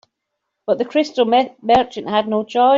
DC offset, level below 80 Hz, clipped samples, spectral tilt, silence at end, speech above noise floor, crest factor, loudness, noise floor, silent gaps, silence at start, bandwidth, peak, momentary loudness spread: under 0.1%; -56 dBFS; under 0.1%; -5.5 dB/octave; 0 s; 61 dB; 14 dB; -18 LUFS; -77 dBFS; none; 0.7 s; 7.6 kHz; -2 dBFS; 5 LU